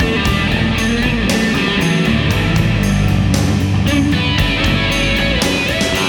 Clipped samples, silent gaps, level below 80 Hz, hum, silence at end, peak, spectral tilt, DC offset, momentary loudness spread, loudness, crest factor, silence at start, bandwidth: under 0.1%; none; -24 dBFS; none; 0 s; -2 dBFS; -5 dB/octave; under 0.1%; 1 LU; -14 LUFS; 12 dB; 0 s; 18.5 kHz